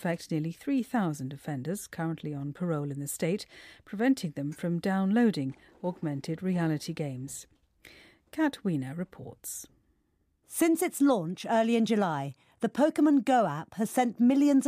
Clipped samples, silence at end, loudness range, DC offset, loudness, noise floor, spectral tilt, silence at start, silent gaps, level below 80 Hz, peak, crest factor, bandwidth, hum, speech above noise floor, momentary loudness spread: under 0.1%; 0 s; 8 LU; under 0.1%; -29 LUFS; -73 dBFS; -6 dB/octave; 0 s; none; -70 dBFS; -14 dBFS; 14 dB; 15.5 kHz; none; 44 dB; 14 LU